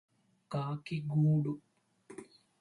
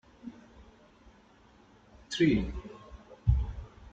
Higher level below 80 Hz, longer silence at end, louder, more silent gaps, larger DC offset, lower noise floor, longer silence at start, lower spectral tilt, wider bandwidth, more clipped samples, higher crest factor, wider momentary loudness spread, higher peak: second, -74 dBFS vs -40 dBFS; first, 0.4 s vs 0.05 s; second, -34 LUFS vs -31 LUFS; neither; neither; about the same, -58 dBFS vs -60 dBFS; first, 0.5 s vs 0.25 s; first, -9 dB/octave vs -6.5 dB/octave; first, 10.5 kHz vs 8.2 kHz; neither; second, 14 dB vs 22 dB; about the same, 22 LU vs 22 LU; second, -22 dBFS vs -12 dBFS